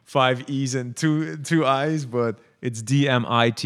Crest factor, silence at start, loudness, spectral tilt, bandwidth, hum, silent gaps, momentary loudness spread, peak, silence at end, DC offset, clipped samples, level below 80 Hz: 20 dB; 0.1 s; -23 LUFS; -5.5 dB/octave; 13 kHz; none; none; 8 LU; -2 dBFS; 0 s; under 0.1%; under 0.1%; -74 dBFS